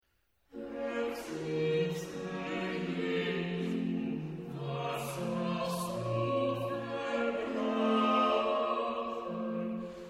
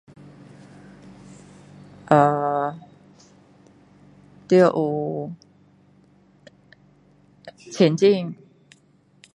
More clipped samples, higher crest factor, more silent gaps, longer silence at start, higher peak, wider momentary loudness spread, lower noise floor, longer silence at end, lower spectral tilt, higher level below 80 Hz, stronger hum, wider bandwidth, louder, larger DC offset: neither; second, 18 dB vs 24 dB; neither; second, 0.55 s vs 2.1 s; second, -16 dBFS vs 0 dBFS; second, 10 LU vs 27 LU; first, -76 dBFS vs -58 dBFS; second, 0 s vs 1 s; about the same, -6 dB/octave vs -7 dB/octave; about the same, -66 dBFS vs -66 dBFS; neither; first, 16 kHz vs 10.5 kHz; second, -34 LUFS vs -20 LUFS; neither